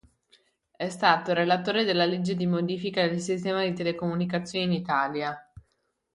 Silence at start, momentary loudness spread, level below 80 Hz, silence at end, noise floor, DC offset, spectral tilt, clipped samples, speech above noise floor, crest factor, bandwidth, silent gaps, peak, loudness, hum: 0.8 s; 7 LU; -64 dBFS; 0.55 s; -75 dBFS; under 0.1%; -5.5 dB/octave; under 0.1%; 48 dB; 22 dB; 11 kHz; none; -6 dBFS; -26 LUFS; none